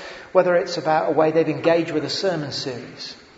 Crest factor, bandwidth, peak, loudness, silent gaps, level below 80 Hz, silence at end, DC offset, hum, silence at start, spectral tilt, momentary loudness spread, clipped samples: 18 dB; 8 kHz; -2 dBFS; -21 LUFS; none; -62 dBFS; 0.2 s; under 0.1%; none; 0 s; -5 dB/octave; 12 LU; under 0.1%